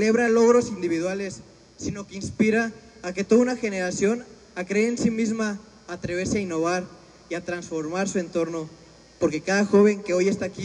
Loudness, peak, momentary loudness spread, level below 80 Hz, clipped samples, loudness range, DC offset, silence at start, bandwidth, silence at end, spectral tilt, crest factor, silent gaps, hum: -24 LUFS; -8 dBFS; 16 LU; -56 dBFS; under 0.1%; 4 LU; under 0.1%; 0 s; 10.5 kHz; 0 s; -5.5 dB/octave; 16 dB; none; none